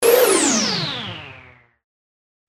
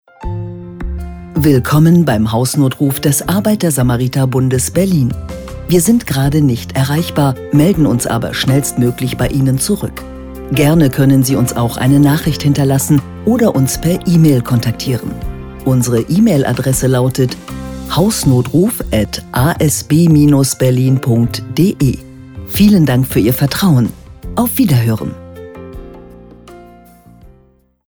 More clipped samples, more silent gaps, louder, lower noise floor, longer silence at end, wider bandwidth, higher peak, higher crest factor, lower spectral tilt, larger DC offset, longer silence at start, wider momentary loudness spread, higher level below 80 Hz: neither; neither; second, -17 LUFS vs -13 LUFS; about the same, -47 dBFS vs -50 dBFS; first, 1.1 s vs 0.6 s; second, 16.5 kHz vs over 20 kHz; about the same, -2 dBFS vs 0 dBFS; first, 18 dB vs 12 dB; second, -2 dB/octave vs -6 dB/octave; neither; second, 0 s vs 0.2 s; first, 20 LU vs 15 LU; second, -60 dBFS vs -32 dBFS